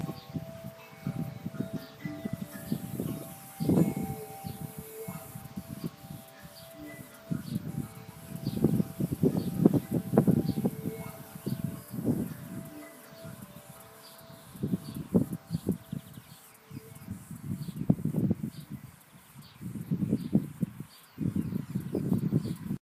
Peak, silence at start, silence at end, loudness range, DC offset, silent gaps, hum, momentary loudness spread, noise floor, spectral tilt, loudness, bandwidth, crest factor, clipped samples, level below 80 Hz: -4 dBFS; 0 s; 0.05 s; 10 LU; under 0.1%; none; none; 19 LU; -54 dBFS; -7.5 dB/octave; -33 LUFS; 15.5 kHz; 28 dB; under 0.1%; -58 dBFS